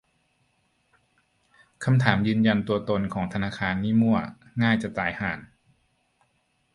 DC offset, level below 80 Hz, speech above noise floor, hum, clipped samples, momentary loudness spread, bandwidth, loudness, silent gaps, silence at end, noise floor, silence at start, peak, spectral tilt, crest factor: under 0.1%; -54 dBFS; 46 dB; none; under 0.1%; 9 LU; 11 kHz; -25 LUFS; none; 1.3 s; -70 dBFS; 1.8 s; -2 dBFS; -7.5 dB/octave; 24 dB